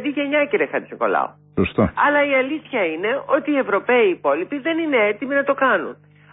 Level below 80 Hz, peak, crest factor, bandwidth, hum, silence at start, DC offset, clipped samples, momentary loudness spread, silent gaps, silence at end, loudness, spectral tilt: -48 dBFS; -6 dBFS; 14 dB; 4 kHz; 50 Hz at -50 dBFS; 0 s; under 0.1%; under 0.1%; 6 LU; none; 0.4 s; -19 LUFS; -10.5 dB/octave